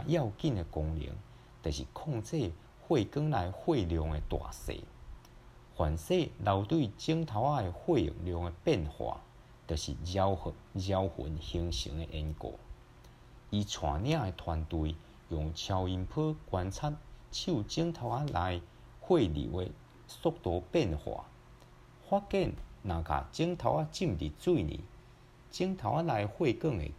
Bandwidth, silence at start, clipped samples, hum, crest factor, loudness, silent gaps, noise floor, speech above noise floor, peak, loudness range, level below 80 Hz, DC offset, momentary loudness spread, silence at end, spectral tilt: 14.5 kHz; 0 s; under 0.1%; none; 20 dB; -34 LUFS; none; -57 dBFS; 24 dB; -14 dBFS; 4 LU; -48 dBFS; under 0.1%; 12 LU; 0 s; -6.5 dB/octave